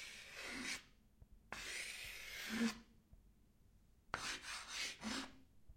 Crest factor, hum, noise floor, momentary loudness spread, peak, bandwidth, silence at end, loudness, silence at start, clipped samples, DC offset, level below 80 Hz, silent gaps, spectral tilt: 26 dB; none; -70 dBFS; 9 LU; -24 dBFS; 16.5 kHz; 0 s; -46 LUFS; 0 s; under 0.1%; under 0.1%; -68 dBFS; none; -2 dB/octave